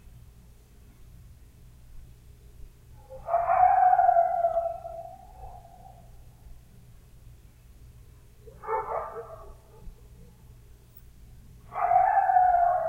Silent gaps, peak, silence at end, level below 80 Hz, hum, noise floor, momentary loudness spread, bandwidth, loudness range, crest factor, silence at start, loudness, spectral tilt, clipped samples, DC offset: none; -10 dBFS; 0 s; -52 dBFS; none; -53 dBFS; 27 LU; 16 kHz; 14 LU; 20 dB; 1.9 s; -24 LUFS; -6 dB/octave; under 0.1%; under 0.1%